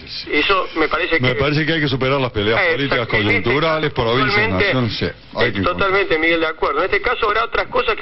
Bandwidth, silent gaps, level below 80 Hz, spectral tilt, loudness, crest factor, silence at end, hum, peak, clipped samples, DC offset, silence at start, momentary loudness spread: 6 kHz; none; -38 dBFS; -7.5 dB/octave; -17 LUFS; 14 dB; 0 s; none; -4 dBFS; under 0.1%; under 0.1%; 0 s; 4 LU